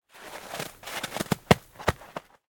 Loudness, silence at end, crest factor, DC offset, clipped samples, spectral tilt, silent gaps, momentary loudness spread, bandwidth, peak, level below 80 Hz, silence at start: -29 LUFS; 0.3 s; 28 dB; under 0.1%; under 0.1%; -4.5 dB/octave; none; 18 LU; 18 kHz; -2 dBFS; -48 dBFS; 0.15 s